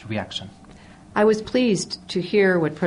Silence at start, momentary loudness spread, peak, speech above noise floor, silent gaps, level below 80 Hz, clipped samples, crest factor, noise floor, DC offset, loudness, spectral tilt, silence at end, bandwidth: 0 s; 13 LU; -8 dBFS; 24 dB; none; -54 dBFS; under 0.1%; 16 dB; -45 dBFS; under 0.1%; -21 LUFS; -5 dB/octave; 0 s; 10.5 kHz